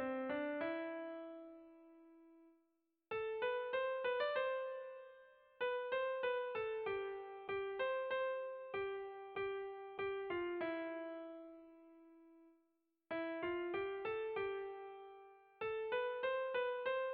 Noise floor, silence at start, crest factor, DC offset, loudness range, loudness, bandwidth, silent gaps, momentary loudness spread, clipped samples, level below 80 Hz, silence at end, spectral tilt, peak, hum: -83 dBFS; 0 s; 14 dB; under 0.1%; 5 LU; -42 LUFS; 4.8 kHz; none; 15 LU; under 0.1%; -80 dBFS; 0 s; -1.5 dB/octave; -28 dBFS; none